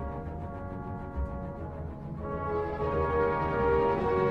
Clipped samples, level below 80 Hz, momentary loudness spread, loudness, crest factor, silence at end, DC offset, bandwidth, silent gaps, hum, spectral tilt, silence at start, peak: under 0.1%; -42 dBFS; 12 LU; -31 LUFS; 16 dB; 0 s; under 0.1%; 6.2 kHz; none; none; -9 dB/octave; 0 s; -14 dBFS